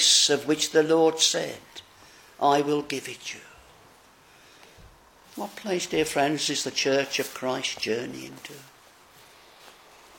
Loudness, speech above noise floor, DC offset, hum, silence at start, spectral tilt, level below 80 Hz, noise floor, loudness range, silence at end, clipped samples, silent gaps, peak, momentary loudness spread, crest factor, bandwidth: -24 LUFS; 29 dB; under 0.1%; none; 0 s; -2 dB/octave; -66 dBFS; -55 dBFS; 8 LU; 0.5 s; under 0.1%; none; -8 dBFS; 21 LU; 20 dB; 17 kHz